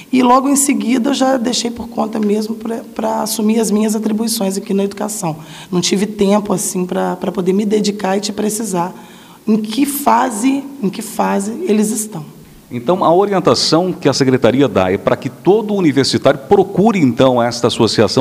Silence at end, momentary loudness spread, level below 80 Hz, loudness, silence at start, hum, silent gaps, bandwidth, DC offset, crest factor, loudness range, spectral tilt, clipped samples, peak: 0 s; 9 LU; -52 dBFS; -15 LUFS; 0 s; none; none; 16 kHz; under 0.1%; 14 dB; 4 LU; -4.5 dB/octave; under 0.1%; 0 dBFS